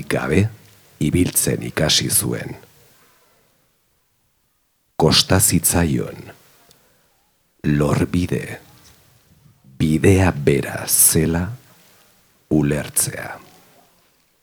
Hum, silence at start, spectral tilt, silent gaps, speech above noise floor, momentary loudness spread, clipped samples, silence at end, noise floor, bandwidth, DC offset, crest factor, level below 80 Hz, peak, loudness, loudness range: none; 0 s; -4 dB/octave; none; 48 dB; 19 LU; under 0.1%; 1.05 s; -66 dBFS; over 20 kHz; under 0.1%; 20 dB; -42 dBFS; 0 dBFS; -17 LUFS; 7 LU